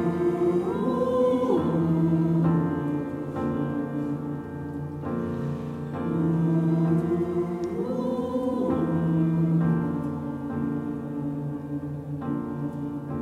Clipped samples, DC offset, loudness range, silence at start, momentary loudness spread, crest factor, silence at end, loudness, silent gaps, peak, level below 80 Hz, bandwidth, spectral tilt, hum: under 0.1%; under 0.1%; 6 LU; 0 s; 10 LU; 14 dB; 0 s; -27 LUFS; none; -12 dBFS; -56 dBFS; 6.4 kHz; -10 dB/octave; none